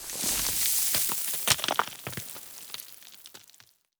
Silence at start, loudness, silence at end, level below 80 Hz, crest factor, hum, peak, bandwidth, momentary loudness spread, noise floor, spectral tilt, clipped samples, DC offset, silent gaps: 0 s; -26 LUFS; 0.6 s; -58 dBFS; 26 dB; none; -4 dBFS; over 20 kHz; 22 LU; -59 dBFS; 0 dB/octave; under 0.1%; under 0.1%; none